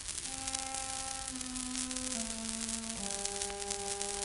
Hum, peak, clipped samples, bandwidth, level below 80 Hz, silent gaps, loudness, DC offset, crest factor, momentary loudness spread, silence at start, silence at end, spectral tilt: none; -10 dBFS; under 0.1%; 12.5 kHz; -56 dBFS; none; -36 LUFS; under 0.1%; 28 dB; 2 LU; 0 s; 0 s; -1 dB/octave